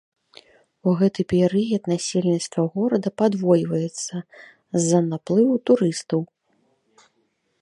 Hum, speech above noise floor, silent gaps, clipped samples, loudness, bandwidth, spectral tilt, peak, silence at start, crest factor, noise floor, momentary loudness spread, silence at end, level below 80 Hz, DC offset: none; 49 dB; none; under 0.1%; -22 LUFS; 11.5 kHz; -6 dB/octave; -6 dBFS; 0.85 s; 18 dB; -69 dBFS; 8 LU; 1.35 s; -62 dBFS; under 0.1%